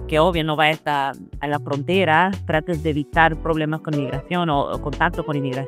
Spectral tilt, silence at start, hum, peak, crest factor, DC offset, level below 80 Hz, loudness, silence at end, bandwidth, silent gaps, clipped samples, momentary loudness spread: -6.5 dB/octave; 0 s; none; -2 dBFS; 20 dB; under 0.1%; -38 dBFS; -21 LUFS; 0 s; 15 kHz; none; under 0.1%; 8 LU